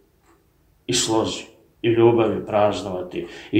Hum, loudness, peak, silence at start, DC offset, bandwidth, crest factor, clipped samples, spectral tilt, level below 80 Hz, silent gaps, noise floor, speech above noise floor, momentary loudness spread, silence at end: none; -21 LUFS; -2 dBFS; 0.9 s; under 0.1%; 14 kHz; 18 dB; under 0.1%; -4.5 dB/octave; -54 dBFS; none; -60 dBFS; 40 dB; 15 LU; 0 s